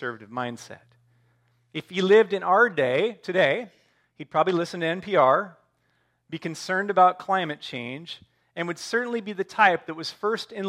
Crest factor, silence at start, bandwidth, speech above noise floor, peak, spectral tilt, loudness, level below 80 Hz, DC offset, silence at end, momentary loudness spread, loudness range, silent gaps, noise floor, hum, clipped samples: 20 dB; 0 s; 13 kHz; 46 dB; -4 dBFS; -5 dB/octave; -24 LUFS; -76 dBFS; under 0.1%; 0 s; 18 LU; 4 LU; none; -70 dBFS; none; under 0.1%